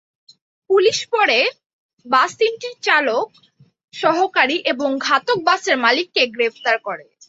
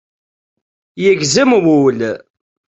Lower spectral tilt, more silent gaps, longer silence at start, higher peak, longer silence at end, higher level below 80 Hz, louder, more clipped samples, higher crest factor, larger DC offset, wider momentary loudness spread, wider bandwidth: second, -2 dB/octave vs -4.5 dB/octave; first, 1.66-1.97 s, 3.84-3.88 s vs none; second, 0.7 s vs 0.95 s; about the same, -2 dBFS vs -2 dBFS; second, 0.25 s vs 0.6 s; second, -70 dBFS vs -56 dBFS; second, -17 LUFS vs -13 LUFS; neither; about the same, 18 dB vs 14 dB; neither; second, 6 LU vs 11 LU; about the same, 8 kHz vs 8.4 kHz